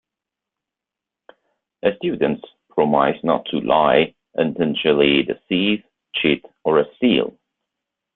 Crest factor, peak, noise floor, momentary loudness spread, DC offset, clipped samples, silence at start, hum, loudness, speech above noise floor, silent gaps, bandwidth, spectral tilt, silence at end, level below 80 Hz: 20 dB; -2 dBFS; -86 dBFS; 8 LU; under 0.1%; under 0.1%; 1.85 s; none; -19 LUFS; 68 dB; none; 4.3 kHz; -10 dB/octave; 0.85 s; -56 dBFS